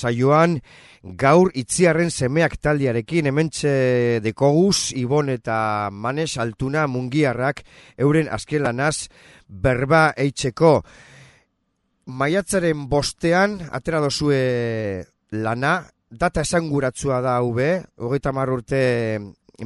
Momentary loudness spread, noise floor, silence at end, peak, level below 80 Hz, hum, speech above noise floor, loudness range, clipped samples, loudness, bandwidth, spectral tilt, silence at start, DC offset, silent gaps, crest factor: 9 LU; -71 dBFS; 0 s; 0 dBFS; -46 dBFS; none; 51 dB; 3 LU; under 0.1%; -20 LUFS; 11.5 kHz; -5.5 dB/octave; 0 s; under 0.1%; none; 20 dB